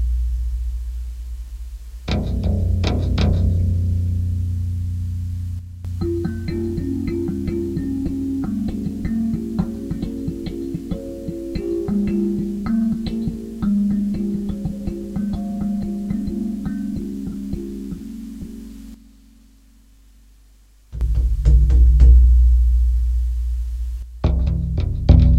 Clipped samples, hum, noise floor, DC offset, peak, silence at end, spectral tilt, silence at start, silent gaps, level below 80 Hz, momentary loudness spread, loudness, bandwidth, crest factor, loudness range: under 0.1%; none; -50 dBFS; under 0.1%; 0 dBFS; 0 s; -9 dB/octave; 0 s; none; -22 dBFS; 15 LU; -22 LUFS; 7.4 kHz; 20 dB; 11 LU